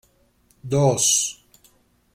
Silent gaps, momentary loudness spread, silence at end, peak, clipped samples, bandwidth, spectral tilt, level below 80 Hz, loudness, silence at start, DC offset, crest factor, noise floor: none; 12 LU; 0.8 s; -6 dBFS; under 0.1%; 16.5 kHz; -3.5 dB/octave; -56 dBFS; -19 LUFS; 0.65 s; under 0.1%; 18 dB; -61 dBFS